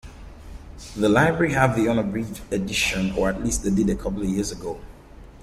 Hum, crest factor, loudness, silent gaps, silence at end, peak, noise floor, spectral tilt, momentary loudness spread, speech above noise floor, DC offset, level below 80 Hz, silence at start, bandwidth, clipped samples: none; 20 dB; -23 LUFS; none; 0 s; -2 dBFS; -44 dBFS; -5 dB/octave; 19 LU; 22 dB; under 0.1%; -38 dBFS; 0.05 s; 15.5 kHz; under 0.1%